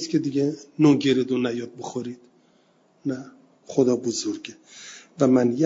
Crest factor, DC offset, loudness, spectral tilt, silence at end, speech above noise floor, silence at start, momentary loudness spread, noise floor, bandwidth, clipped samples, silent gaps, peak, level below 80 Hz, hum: 20 dB; under 0.1%; -23 LUFS; -6 dB/octave; 0 s; 38 dB; 0 s; 21 LU; -61 dBFS; 7.8 kHz; under 0.1%; none; -4 dBFS; -68 dBFS; none